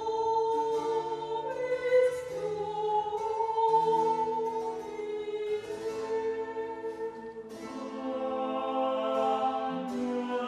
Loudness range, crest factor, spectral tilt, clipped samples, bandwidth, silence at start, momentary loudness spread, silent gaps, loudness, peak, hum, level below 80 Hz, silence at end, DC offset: 7 LU; 16 dB; -5 dB/octave; under 0.1%; 12.5 kHz; 0 s; 11 LU; none; -31 LUFS; -16 dBFS; none; -68 dBFS; 0 s; under 0.1%